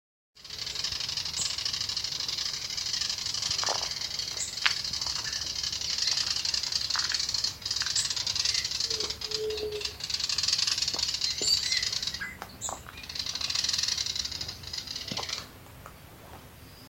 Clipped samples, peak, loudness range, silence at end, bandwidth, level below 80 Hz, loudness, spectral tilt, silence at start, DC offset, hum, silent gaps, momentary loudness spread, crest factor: under 0.1%; -2 dBFS; 4 LU; 0 s; 16.5 kHz; -56 dBFS; -28 LUFS; 0 dB/octave; 0.35 s; under 0.1%; none; none; 11 LU; 30 dB